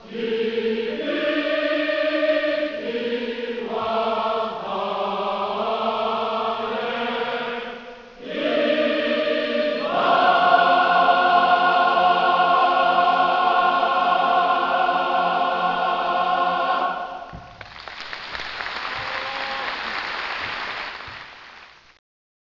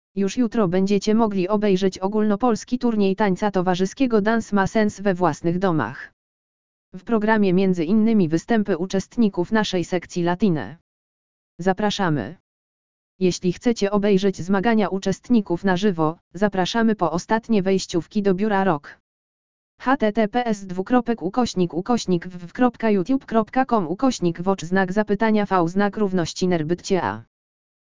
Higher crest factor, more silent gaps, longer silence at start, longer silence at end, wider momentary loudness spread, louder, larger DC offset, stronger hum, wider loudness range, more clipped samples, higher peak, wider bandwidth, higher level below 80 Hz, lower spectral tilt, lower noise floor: about the same, 18 dB vs 18 dB; second, none vs 6.13-6.92 s, 10.81-11.58 s, 12.40-13.19 s, 16.21-16.31 s, 19.00-19.78 s; second, 0 s vs 0.15 s; about the same, 0.8 s vs 0.7 s; first, 14 LU vs 6 LU; about the same, -21 LUFS vs -21 LUFS; second, under 0.1% vs 1%; neither; first, 10 LU vs 3 LU; neither; about the same, -2 dBFS vs -4 dBFS; second, 6 kHz vs 7.6 kHz; second, -58 dBFS vs -50 dBFS; about the same, -5 dB/octave vs -6 dB/octave; second, -46 dBFS vs under -90 dBFS